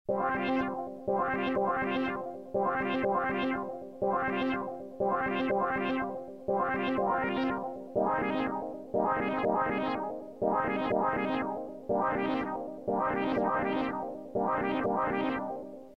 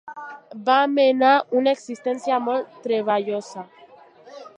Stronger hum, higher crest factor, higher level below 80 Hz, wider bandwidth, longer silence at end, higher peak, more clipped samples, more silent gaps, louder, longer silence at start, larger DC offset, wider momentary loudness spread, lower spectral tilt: neither; about the same, 16 dB vs 18 dB; first, -62 dBFS vs -82 dBFS; second, 6.2 kHz vs 9.6 kHz; about the same, 0 s vs 0.1 s; second, -14 dBFS vs -4 dBFS; neither; neither; second, -31 LUFS vs -21 LUFS; about the same, 0.1 s vs 0.05 s; first, 0.1% vs under 0.1%; second, 7 LU vs 20 LU; first, -7.5 dB/octave vs -4.5 dB/octave